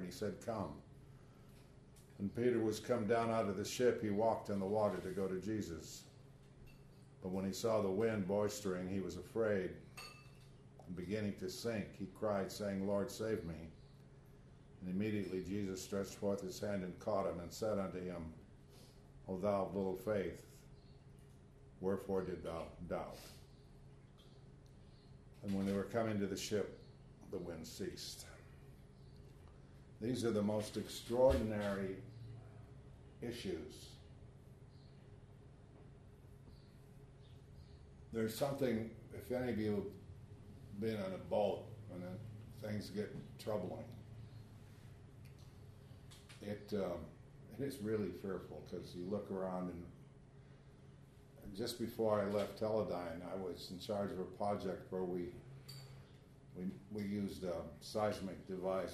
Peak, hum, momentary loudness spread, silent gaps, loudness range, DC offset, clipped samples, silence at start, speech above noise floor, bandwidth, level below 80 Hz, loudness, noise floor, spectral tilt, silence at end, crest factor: -20 dBFS; none; 24 LU; none; 10 LU; under 0.1%; under 0.1%; 0 s; 21 dB; 13.5 kHz; -64 dBFS; -41 LUFS; -61 dBFS; -6 dB/octave; 0 s; 22 dB